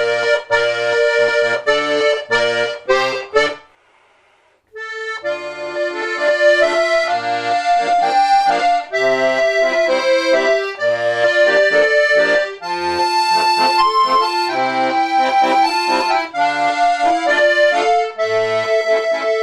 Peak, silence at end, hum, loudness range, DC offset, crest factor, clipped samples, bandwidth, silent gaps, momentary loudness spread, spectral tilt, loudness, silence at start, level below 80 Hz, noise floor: 0 dBFS; 0 s; none; 5 LU; under 0.1%; 16 dB; under 0.1%; 12.5 kHz; none; 7 LU; -2.5 dB/octave; -15 LUFS; 0 s; -54 dBFS; -56 dBFS